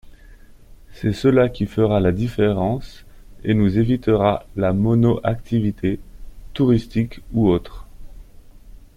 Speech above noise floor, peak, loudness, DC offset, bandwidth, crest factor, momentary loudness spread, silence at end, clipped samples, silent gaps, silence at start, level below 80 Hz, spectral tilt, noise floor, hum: 25 dB; -4 dBFS; -20 LUFS; under 0.1%; 12.5 kHz; 18 dB; 8 LU; 0.2 s; under 0.1%; none; 0.7 s; -38 dBFS; -9 dB/octave; -44 dBFS; none